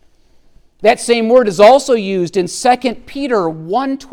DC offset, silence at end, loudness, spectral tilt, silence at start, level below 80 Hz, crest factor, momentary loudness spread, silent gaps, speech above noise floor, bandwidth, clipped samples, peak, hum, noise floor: under 0.1%; 0.05 s; -13 LUFS; -4.5 dB/octave; 0.8 s; -48 dBFS; 14 dB; 10 LU; none; 35 dB; 15 kHz; under 0.1%; 0 dBFS; none; -48 dBFS